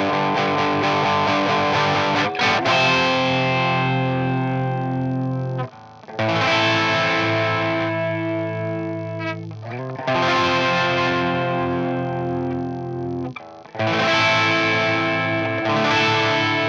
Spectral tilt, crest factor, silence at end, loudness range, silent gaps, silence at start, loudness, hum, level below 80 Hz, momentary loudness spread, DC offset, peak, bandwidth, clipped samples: -5.5 dB/octave; 14 dB; 0 s; 4 LU; none; 0 s; -20 LUFS; none; -60 dBFS; 11 LU; under 0.1%; -6 dBFS; 7.8 kHz; under 0.1%